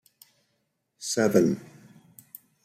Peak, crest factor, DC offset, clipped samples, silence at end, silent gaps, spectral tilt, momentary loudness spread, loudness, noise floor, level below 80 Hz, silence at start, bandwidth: -6 dBFS; 24 dB; under 0.1%; under 0.1%; 1 s; none; -5 dB/octave; 25 LU; -25 LUFS; -76 dBFS; -72 dBFS; 1 s; 16 kHz